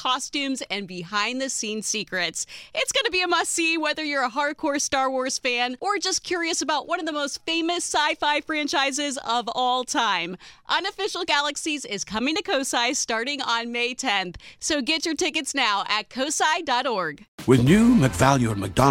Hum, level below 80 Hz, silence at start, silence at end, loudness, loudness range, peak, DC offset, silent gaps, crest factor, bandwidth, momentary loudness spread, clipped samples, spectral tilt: none; -50 dBFS; 0 s; 0 s; -23 LUFS; 3 LU; -2 dBFS; under 0.1%; 17.28-17.38 s; 22 dB; 16.5 kHz; 7 LU; under 0.1%; -3.5 dB/octave